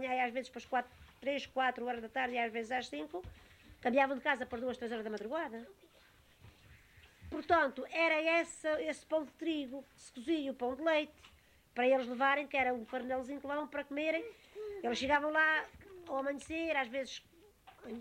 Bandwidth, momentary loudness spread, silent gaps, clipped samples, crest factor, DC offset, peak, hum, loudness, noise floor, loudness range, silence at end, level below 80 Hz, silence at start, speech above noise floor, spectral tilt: 16 kHz; 15 LU; none; under 0.1%; 20 dB; under 0.1%; -18 dBFS; none; -35 LUFS; -65 dBFS; 3 LU; 0 s; -66 dBFS; 0 s; 29 dB; -3.5 dB/octave